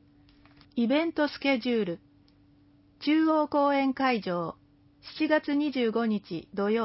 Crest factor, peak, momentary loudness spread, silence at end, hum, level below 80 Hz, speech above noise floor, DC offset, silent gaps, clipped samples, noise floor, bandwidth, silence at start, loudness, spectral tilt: 16 dB; -12 dBFS; 10 LU; 0 s; none; -68 dBFS; 33 dB; under 0.1%; none; under 0.1%; -60 dBFS; 5.8 kHz; 0.75 s; -28 LUFS; -9.5 dB/octave